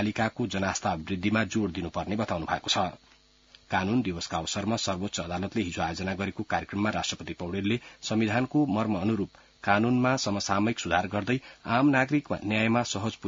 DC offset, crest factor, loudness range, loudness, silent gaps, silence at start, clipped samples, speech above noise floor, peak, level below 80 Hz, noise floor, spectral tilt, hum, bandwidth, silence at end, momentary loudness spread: under 0.1%; 22 dB; 4 LU; -28 LUFS; none; 0 s; under 0.1%; 30 dB; -6 dBFS; -58 dBFS; -58 dBFS; -5 dB/octave; none; 7.8 kHz; 0 s; 7 LU